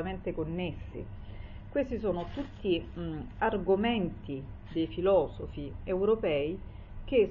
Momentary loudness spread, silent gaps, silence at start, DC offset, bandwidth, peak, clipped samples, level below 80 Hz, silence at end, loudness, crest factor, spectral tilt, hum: 15 LU; none; 0 s; under 0.1%; 5.6 kHz; -14 dBFS; under 0.1%; -46 dBFS; 0 s; -32 LUFS; 18 dB; -9 dB/octave; none